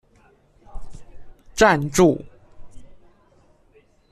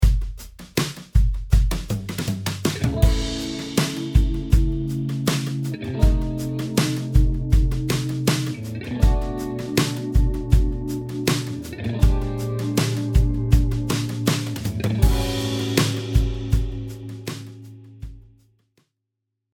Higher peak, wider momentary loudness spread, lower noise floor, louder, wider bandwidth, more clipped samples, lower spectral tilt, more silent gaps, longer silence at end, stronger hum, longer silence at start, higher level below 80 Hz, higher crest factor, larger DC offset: about the same, -2 dBFS vs -2 dBFS; first, 14 LU vs 10 LU; second, -57 dBFS vs -80 dBFS; first, -18 LUFS vs -23 LUFS; second, 13.5 kHz vs 18 kHz; neither; about the same, -5 dB/octave vs -5.5 dB/octave; neither; second, 1.2 s vs 1.35 s; neither; first, 0.75 s vs 0 s; second, -42 dBFS vs -24 dBFS; about the same, 22 dB vs 20 dB; neither